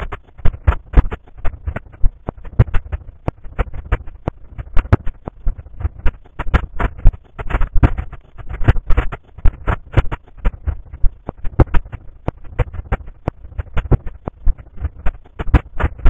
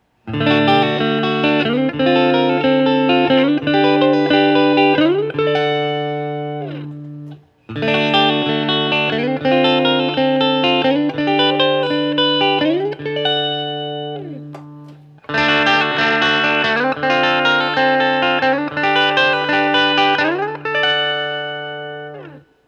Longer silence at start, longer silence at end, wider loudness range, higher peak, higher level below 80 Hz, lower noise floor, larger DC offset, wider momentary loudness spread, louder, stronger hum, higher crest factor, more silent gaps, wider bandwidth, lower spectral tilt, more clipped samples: second, 0 s vs 0.25 s; second, 0 s vs 0.3 s; about the same, 4 LU vs 5 LU; about the same, 0 dBFS vs -2 dBFS; first, -20 dBFS vs -60 dBFS; second, -31 dBFS vs -40 dBFS; neither; about the same, 13 LU vs 13 LU; second, -22 LUFS vs -15 LUFS; neither; about the same, 16 dB vs 16 dB; neither; second, 3.8 kHz vs 7.6 kHz; first, -9 dB/octave vs -6 dB/octave; first, 0.6% vs under 0.1%